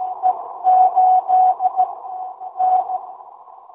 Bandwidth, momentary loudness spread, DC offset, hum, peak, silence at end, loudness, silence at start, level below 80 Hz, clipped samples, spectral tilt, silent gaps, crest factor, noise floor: 2.9 kHz; 16 LU; under 0.1%; none; -4 dBFS; 0.3 s; -17 LUFS; 0 s; -76 dBFS; under 0.1%; -6.5 dB/octave; none; 14 dB; -41 dBFS